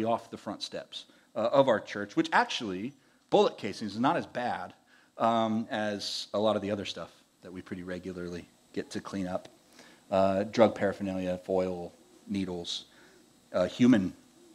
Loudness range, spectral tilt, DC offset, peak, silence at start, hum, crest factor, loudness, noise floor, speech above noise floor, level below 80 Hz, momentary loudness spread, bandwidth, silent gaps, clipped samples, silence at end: 6 LU; -5.5 dB/octave; under 0.1%; -8 dBFS; 0 s; none; 22 dB; -30 LUFS; -59 dBFS; 30 dB; -70 dBFS; 16 LU; 13 kHz; none; under 0.1%; 0.45 s